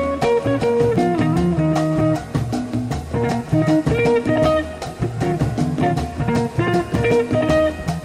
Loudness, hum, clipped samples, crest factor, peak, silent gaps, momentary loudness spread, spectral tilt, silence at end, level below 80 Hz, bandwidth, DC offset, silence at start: -19 LUFS; none; under 0.1%; 12 dB; -6 dBFS; none; 6 LU; -7 dB/octave; 0 s; -36 dBFS; 14.5 kHz; under 0.1%; 0 s